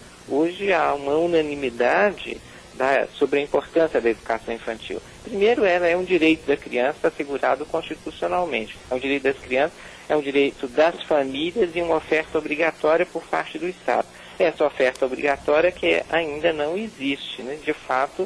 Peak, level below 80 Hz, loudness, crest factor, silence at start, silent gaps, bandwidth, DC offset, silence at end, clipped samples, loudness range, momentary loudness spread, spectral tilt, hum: -8 dBFS; -52 dBFS; -22 LUFS; 14 dB; 0 s; none; 11 kHz; under 0.1%; 0 s; under 0.1%; 2 LU; 10 LU; -5 dB/octave; none